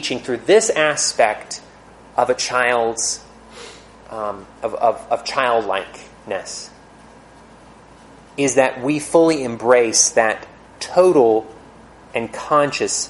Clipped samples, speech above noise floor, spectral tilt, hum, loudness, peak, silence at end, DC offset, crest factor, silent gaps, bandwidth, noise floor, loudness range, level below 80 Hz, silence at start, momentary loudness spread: under 0.1%; 27 dB; -2.5 dB/octave; none; -18 LUFS; 0 dBFS; 0 s; under 0.1%; 20 dB; none; 11.5 kHz; -44 dBFS; 8 LU; -54 dBFS; 0 s; 18 LU